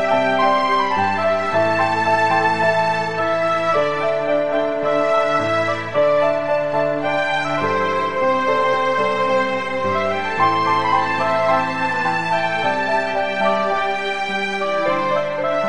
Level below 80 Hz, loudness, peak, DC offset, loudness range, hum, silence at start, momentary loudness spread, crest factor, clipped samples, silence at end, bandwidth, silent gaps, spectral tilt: -58 dBFS; -18 LUFS; -4 dBFS; 2%; 1 LU; none; 0 s; 4 LU; 14 dB; under 0.1%; 0 s; 10.5 kHz; none; -5 dB/octave